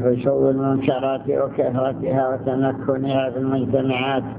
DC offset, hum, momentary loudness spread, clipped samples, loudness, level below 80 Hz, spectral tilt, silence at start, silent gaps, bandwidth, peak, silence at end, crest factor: under 0.1%; none; 3 LU; under 0.1%; -21 LUFS; -52 dBFS; -11.5 dB/octave; 0 s; none; 4 kHz; -4 dBFS; 0 s; 16 dB